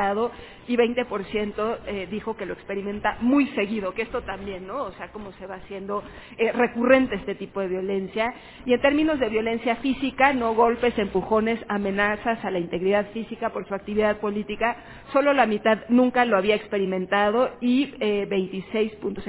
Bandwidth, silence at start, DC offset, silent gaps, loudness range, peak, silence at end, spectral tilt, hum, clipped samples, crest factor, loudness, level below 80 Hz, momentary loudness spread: 4 kHz; 0 s; under 0.1%; none; 5 LU; -2 dBFS; 0 s; -9.5 dB/octave; none; under 0.1%; 22 dB; -24 LUFS; -52 dBFS; 12 LU